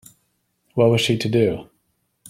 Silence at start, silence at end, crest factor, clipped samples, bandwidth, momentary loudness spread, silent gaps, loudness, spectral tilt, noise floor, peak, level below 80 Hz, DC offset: 0.75 s; 0.65 s; 18 dB; under 0.1%; 15 kHz; 12 LU; none; -19 LUFS; -6 dB/octave; -69 dBFS; -4 dBFS; -54 dBFS; under 0.1%